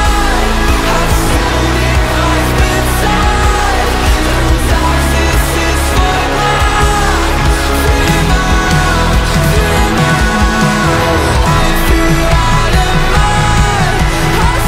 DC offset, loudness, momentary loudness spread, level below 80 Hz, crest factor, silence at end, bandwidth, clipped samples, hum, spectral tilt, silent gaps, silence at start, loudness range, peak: under 0.1%; -11 LUFS; 2 LU; -14 dBFS; 10 dB; 0 s; 16.5 kHz; under 0.1%; none; -4.5 dB/octave; none; 0 s; 1 LU; 0 dBFS